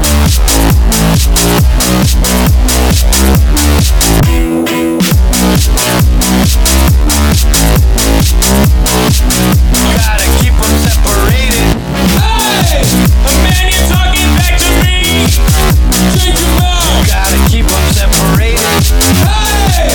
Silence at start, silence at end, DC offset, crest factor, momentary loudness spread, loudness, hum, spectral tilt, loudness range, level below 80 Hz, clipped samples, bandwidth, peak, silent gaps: 0 s; 0 s; 0.6%; 8 dB; 1 LU; -8 LUFS; none; -4 dB/octave; 1 LU; -10 dBFS; under 0.1%; 19.5 kHz; 0 dBFS; none